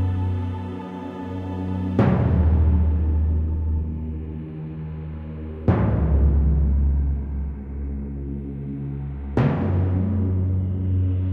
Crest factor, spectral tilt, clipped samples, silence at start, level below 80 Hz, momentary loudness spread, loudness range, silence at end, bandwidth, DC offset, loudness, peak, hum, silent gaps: 14 dB; -11 dB/octave; under 0.1%; 0 s; -26 dBFS; 13 LU; 3 LU; 0 s; 3.8 kHz; under 0.1%; -24 LUFS; -6 dBFS; none; none